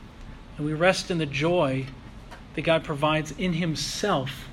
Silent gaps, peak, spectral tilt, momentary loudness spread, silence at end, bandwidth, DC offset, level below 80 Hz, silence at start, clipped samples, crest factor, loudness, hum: none; -4 dBFS; -5 dB/octave; 21 LU; 0 s; 15.5 kHz; under 0.1%; -46 dBFS; 0 s; under 0.1%; 22 dB; -25 LUFS; none